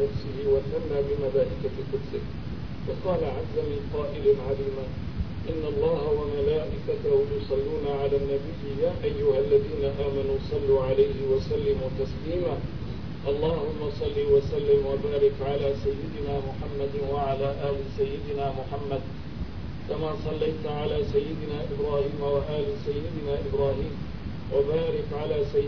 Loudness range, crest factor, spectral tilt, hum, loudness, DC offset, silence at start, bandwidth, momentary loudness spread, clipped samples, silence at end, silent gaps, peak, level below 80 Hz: 5 LU; 16 dB; -8.5 dB/octave; none; -28 LUFS; 1%; 0 s; 5.4 kHz; 10 LU; under 0.1%; 0 s; none; -10 dBFS; -40 dBFS